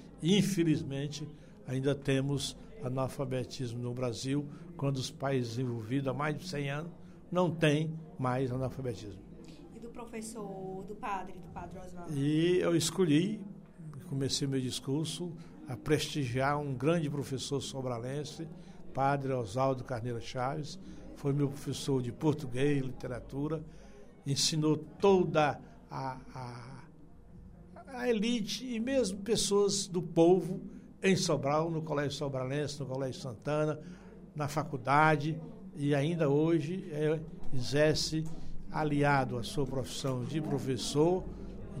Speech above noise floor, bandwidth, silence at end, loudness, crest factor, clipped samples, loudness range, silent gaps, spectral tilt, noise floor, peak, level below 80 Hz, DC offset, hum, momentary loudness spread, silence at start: 21 dB; 16 kHz; 0 s; -33 LUFS; 20 dB; under 0.1%; 5 LU; none; -5.5 dB/octave; -53 dBFS; -12 dBFS; -54 dBFS; under 0.1%; none; 17 LU; 0 s